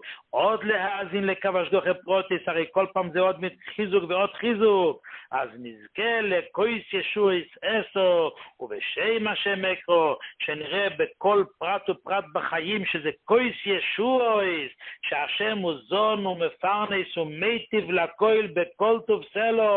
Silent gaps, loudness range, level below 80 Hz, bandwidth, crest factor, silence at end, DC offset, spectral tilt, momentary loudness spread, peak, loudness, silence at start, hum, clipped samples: none; 1 LU; -68 dBFS; 4.4 kHz; 18 dB; 0 s; under 0.1%; -9 dB/octave; 8 LU; -8 dBFS; -25 LUFS; 0 s; none; under 0.1%